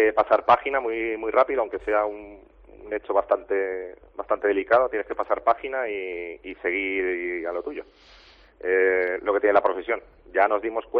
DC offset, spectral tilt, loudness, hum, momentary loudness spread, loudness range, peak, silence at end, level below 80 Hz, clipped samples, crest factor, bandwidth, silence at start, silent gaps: under 0.1%; -2 dB/octave; -24 LUFS; none; 13 LU; 3 LU; -6 dBFS; 0 s; -56 dBFS; under 0.1%; 18 dB; 6 kHz; 0 s; none